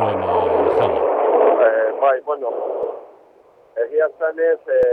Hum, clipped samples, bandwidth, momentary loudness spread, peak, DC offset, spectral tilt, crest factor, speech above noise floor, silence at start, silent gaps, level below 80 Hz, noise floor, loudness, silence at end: none; under 0.1%; 4.5 kHz; 11 LU; -4 dBFS; under 0.1%; -8 dB/octave; 14 dB; 31 dB; 0 s; none; -54 dBFS; -50 dBFS; -18 LUFS; 0 s